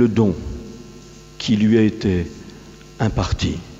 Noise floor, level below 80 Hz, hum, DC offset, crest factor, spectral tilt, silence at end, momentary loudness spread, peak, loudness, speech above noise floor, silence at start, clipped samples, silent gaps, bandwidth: -41 dBFS; -36 dBFS; none; under 0.1%; 16 dB; -6.5 dB/octave; 0 s; 24 LU; -4 dBFS; -20 LUFS; 23 dB; 0 s; under 0.1%; none; 8 kHz